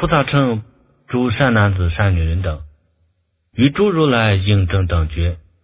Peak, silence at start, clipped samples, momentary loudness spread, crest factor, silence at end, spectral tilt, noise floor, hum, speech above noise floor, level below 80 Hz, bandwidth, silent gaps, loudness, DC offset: 0 dBFS; 0 s; under 0.1%; 10 LU; 16 dB; 0.25 s; -11 dB/octave; -64 dBFS; none; 49 dB; -26 dBFS; 4 kHz; none; -17 LUFS; under 0.1%